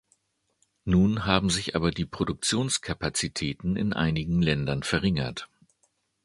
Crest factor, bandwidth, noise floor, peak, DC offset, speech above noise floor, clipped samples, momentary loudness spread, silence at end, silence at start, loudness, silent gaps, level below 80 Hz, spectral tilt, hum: 24 dB; 11.5 kHz; -72 dBFS; -4 dBFS; under 0.1%; 45 dB; under 0.1%; 7 LU; 0.8 s; 0.85 s; -26 LUFS; none; -44 dBFS; -4.5 dB/octave; none